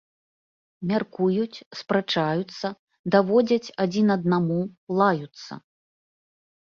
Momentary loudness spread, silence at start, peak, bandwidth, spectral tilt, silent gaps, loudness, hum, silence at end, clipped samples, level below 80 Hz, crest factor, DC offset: 15 LU; 0.8 s; -4 dBFS; 7.2 kHz; -7 dB/octave; 1.66-1.71 s, 2.79-2.88 s, 2.99-3.04 s, 4.78-4.87 s; -24 LUFS; none; 1.05 s; under 0.1%; -66 dBFS; 20 dB; under 0.1%